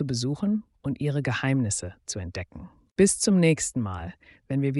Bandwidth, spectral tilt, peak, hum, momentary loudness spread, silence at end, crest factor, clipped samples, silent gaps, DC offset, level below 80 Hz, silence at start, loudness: 11.5 kHz; -5 dB/octave; -8 dBFS; none; 16 LU; 0 s; 18 dB; under 0.1%; 2.92-2.96 s; under 0.1%; -52 dBFS; 0 s; -26 LUFS